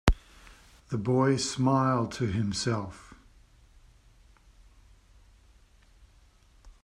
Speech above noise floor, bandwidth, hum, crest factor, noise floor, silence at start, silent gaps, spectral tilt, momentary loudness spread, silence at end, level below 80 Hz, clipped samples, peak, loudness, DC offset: 32 dB; 12.5 kHz; none; 28 dB; -60 dBFS; 0.05 s; none; -5.5 dB/octave; 12 LU; 0.15 s; -42 dBFS; under 0.1%; -4 dBFS; -28 LUFS; under 0.1%